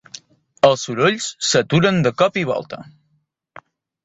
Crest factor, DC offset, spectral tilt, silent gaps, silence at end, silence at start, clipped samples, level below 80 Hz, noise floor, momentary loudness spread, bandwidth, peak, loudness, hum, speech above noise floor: 18 dB; under 0.1%; -4.5 dB/octave; none; 1.2 s; 0.65 s; under 0.1%; -56 dBFS; -67 dBFS; 19 LU; 8.2 kHz; -2 dBFS; -17 LUFS; none; 48 dB